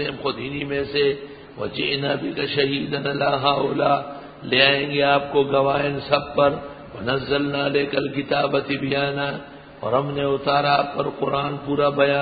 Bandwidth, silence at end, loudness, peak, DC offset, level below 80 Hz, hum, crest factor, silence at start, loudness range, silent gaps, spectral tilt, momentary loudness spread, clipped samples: 5 kHz; 0 s; -21 LUFS; 0 dBFS; under 0.1%; -52 dBFS; none; 22 dB; 0 s; 4 LU; none; -9.5 dB/octave; 10 LU; under 0.1%